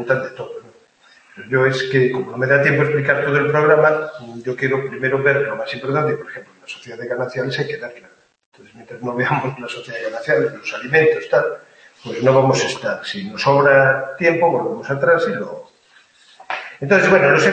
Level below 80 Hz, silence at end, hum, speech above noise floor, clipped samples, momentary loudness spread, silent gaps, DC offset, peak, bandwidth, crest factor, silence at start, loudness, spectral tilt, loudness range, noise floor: -62 dBFS; 0 s; none; 35 dB; under 0.1%; 17 LU; 8.46-8.52 s; under 0.1%; 0 dBFS; 8.8 kHz; 18 dB; 0 s; -17 LUFS; -5.5 dB/octave; 8 LU; -53 dBFS